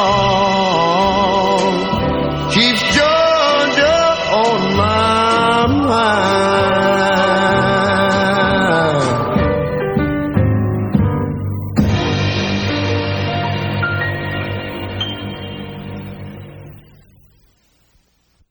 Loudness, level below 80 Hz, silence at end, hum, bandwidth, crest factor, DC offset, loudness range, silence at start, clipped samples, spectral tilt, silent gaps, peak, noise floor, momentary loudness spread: -15 LUFS; -36 dBFS; 1.7 s; none; over 20 kHz; 16 dB; under 0.1%; 11 LU; 0 s; under 0.1%; -5.5 dB/octave; none; 0 dBFS; -58 dBFS; 11 LU